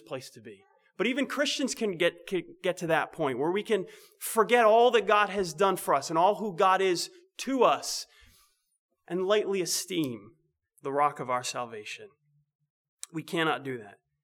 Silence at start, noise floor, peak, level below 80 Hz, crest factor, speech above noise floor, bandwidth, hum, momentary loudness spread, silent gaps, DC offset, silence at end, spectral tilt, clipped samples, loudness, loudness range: 0.1 s; -67 dBFS; -10 dBFS; -72 dBFS; 20 dB; 39 dB; over 20 kHz; none; 17 LU; 8.79-8.89 s, 12.55-12.59 s, 12.70-12.98 s; under 0.1%; 0.35 s; -3.5 dB/octave; under 0.1%; -27 LUFS; 8 LU